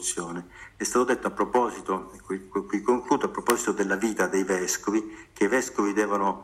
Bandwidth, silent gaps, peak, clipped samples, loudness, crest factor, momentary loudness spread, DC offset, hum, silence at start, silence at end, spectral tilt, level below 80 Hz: 16 kHz; none; -2 dBFS; under 0.1%; -26 LUFS; 24 dB; 8 LU; under 0.1%; none; 0 s; 0 s; -3.5 dB/octave; -58 dBFS